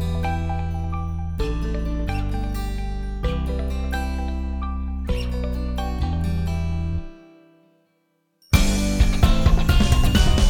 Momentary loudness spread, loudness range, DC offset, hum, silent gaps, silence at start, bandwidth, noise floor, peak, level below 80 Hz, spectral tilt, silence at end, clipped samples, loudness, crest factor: 10 LU; 5 LU; under 0.1%; none; none; 0 s; 20 kHz; -68 dBFS; -2 dBFS; -24 dBFS; -5.5 dB/octave; 0 s; under 0.1%; -24 LUFS; 18 dB